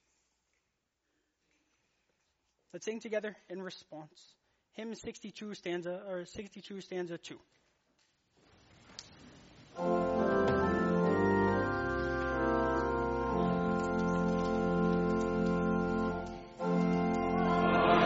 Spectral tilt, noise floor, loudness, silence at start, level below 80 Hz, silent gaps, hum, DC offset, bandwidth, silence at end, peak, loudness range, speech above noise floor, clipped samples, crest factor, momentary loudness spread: -6 dB/octave; -83 dBFS; -32 LUFS; 2.75 s; -52 dBFS; none; none; under 0.1%; 8 kHz; 0 s; -14 dBFS; 14 LU; 43 dB; under 0.1%; 20 dB; 17 LU